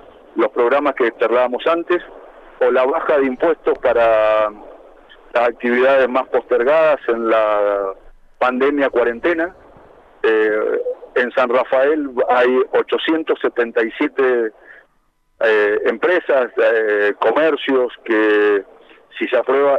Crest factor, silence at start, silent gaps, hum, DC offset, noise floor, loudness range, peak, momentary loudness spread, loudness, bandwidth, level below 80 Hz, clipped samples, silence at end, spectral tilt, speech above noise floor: 12 dB; 0.35 s; none; none; under 0.1%; -61 dBFS; 2 LU; -4 dBFS; 7 LU; -17 LUFS; 6.6 kHz; -54 dBFS; under 0.1%; 0 s; -5.5 dB/octave; 45 dB